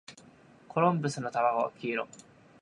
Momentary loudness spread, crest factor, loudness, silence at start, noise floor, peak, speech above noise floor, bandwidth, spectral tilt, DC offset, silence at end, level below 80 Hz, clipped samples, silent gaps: 11 LU; 20 dB; -30 LUFS; 0.1 s; -57 dBFS; -12 dBFS; 27 dB; 11 kHz; -6 dB/octave; under 0.1%; 0.4 s; -76 dBFS; under 0.1%; none